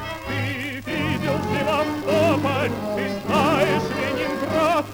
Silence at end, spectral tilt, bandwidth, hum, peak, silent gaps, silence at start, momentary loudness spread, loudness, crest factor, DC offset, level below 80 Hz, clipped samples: 0 s; -5.5 dB/octave; over 20 kHz; none; -6 dBFS; none; 0 s; 7 LU; -22 LUFS; 16 dB; under 0.1%; -48 dBFS; under 0.1%